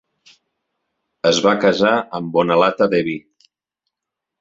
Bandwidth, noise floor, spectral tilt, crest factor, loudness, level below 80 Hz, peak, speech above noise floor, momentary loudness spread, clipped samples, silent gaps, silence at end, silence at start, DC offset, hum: 7.8 kHz; -83 dBFS; -4.5 dB/octave; 18 dB; -17 LUFS; -60 dBFS; 0 dBFS; 67 dB; 6 LU; under 0.1%; none; 1.2 s; 1.25 s; under 0.1%; none